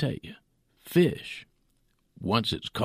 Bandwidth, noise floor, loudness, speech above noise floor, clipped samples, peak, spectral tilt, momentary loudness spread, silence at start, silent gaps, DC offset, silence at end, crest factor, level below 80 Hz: 15.5 kHz; -70 dBFS; -27 LUFS; 42 dB; under 0.1%; -10 dBFS; -6 dB/octave; 17 LU; 0 s; none; under 0.1%; 0 s; 20 dB; -56 dBFS